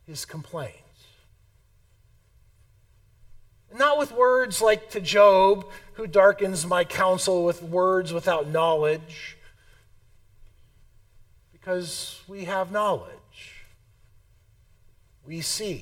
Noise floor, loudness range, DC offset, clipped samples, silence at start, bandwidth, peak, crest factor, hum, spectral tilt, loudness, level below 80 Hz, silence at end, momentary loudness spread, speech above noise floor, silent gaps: -60 dBFS; 14 LU; under 0.1%; under 0.1%; 0.1 s; 16.5 kHz; -4 dBFS; 20 dB; none; -3.5 dB/octave; -23 LUFS; -56 dBFS; 0 s; 21 LU; 37 dB; none